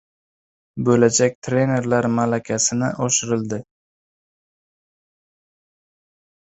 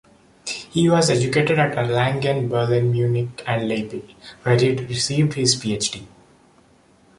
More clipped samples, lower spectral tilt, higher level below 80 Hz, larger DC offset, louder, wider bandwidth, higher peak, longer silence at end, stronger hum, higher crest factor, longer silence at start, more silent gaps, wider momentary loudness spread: neither; about the same, -4.5 dB/octave vs -5 dB/octave; about the same, -58 dBFS vs -54 dBFS; neither; about the same, -19 LUFS vs -20 LUFS; second, 8.2 kHz vs 11.5 kHz; about the same, -2 dBFS vs -4 dBFS; first, 2.95 s vs 1.1 s; neither; about the same, 20 dB vs 18 dB; first, 0.75 s vs 0.45 s; first, 1.35-1.42 s vs none; about the same, 9 LU vs 11 LU